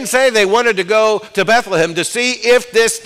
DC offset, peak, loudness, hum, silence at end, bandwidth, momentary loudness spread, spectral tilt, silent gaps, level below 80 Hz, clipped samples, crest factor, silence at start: under 0.1%; -4 dBFS; -13 LUFS; none; 0 s; 16 kHz; 4 LU; -2.5 dB/octave; none; -52 dBFS; under 0.1%; 10 dB; 0 s